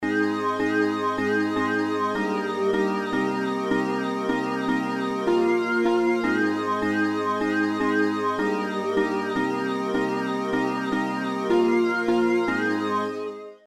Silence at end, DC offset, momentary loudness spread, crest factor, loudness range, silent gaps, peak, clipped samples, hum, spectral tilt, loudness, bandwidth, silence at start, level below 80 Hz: 0.1 s; under 0.1%; 4 LU; 14 dB; 2 LU; none; -10 dBFS; under 0.1%; none; -6 dB/octave; -24 LUFS; 14 kHz; 0 s; -62 dBFS